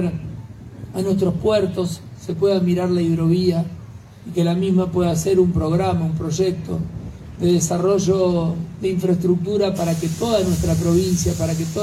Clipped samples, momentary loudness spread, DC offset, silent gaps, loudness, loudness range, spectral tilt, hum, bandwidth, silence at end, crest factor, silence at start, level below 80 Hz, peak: under 0.1%; 13 LU; under 0.1%; none; -20 LUFS; 1 LU; -6.5 dB/octave; none; 15 kHz; 0 s; 14 dB; 0 s; -40 dBFS; -4 dBFS